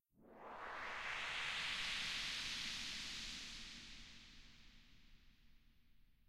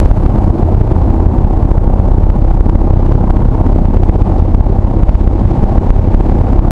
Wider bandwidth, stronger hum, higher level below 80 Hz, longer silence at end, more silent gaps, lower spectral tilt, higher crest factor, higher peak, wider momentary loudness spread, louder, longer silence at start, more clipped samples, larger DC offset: first, 15.5 kHz vs 3 kHz; neither; second, -64 dBFS vs -10 dBFS; first, 0.15 s vs 0 s; neither; second, -0.5 dB/octave vs -11 dB/octave; first, 18 dB vs 8 dB; second, -32 dBFS vs 0 dBFS; first, 19 LU vs 1 LU; second, -44 LUFS vs -12 LUFS; first, 0.15 s vs 0 s; second, under 0.1% vs 1%; neither